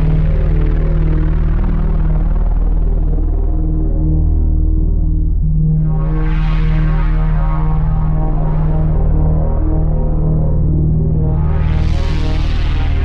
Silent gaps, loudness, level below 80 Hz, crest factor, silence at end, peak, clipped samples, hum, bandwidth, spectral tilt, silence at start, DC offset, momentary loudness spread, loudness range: none; -17 LUFS; -14 dBFS; 8 dB; 0 s; -4 dBFS; under 0.1%; none; 5 kHz; -9.5 dB/octave; 0 s; under 0.1%; 3 LU; 1 LU